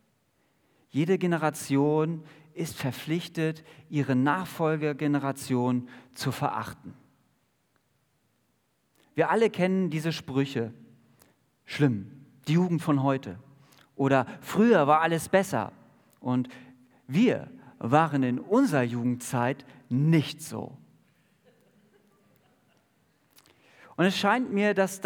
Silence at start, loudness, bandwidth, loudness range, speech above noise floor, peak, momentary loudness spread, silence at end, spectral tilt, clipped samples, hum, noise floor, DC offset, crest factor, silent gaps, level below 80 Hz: 0.95 s; -27 LUFS; over 20 kHz; 7 LU; 46 dB; -6 dBFS; 15 LU; 0 s; -6.5 dB/octave; under 0.1%; none; -72 dBFS; under 0.1%; 22 dB; none; -74 dBFS